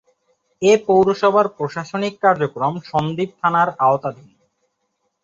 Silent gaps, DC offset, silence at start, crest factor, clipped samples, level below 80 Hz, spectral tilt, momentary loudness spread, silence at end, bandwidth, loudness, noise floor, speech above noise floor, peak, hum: none; under 0.1%; 0.6 s; 18 dB; under 0.1%; -60 dBFS; -6 dB/octave; 10 LU; 1.1 s; 7.8 kHz; -18 LUFS; -72 dBFS; 54 dB; -2 dBFS; none